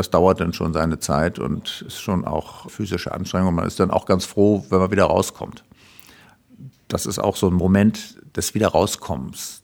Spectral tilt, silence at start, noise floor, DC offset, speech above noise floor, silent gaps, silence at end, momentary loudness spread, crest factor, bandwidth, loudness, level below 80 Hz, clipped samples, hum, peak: -5.5 dB/octave; 0 s; -50 dBFS; under 0.1%; 30 dB; none; 0.05 s; 12 LU; 20 dB; 18.5 kHz; -21 LUFS; -42 dBFS; under 0.1%; none; -2 dBFS